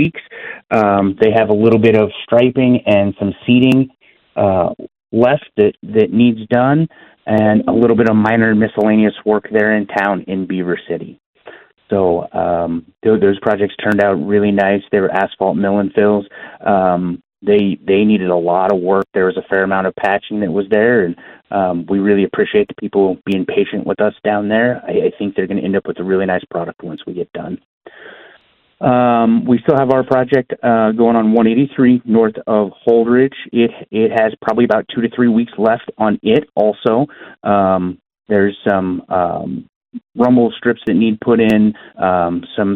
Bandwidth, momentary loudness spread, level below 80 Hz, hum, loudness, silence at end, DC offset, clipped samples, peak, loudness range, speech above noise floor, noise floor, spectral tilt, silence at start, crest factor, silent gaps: 5.2 kHz; 10 LU; -52 dBFS; none; -14 LUFS; 0 s; under 0.1%; under 0.1%; 0 dBFS; 5 LU; 37 dB; -50 dBFS; -9 dB/octave; 0 s; 14 dB; 11.26-11.33 s, 27.65-27.81 s, 39.69-39.81 s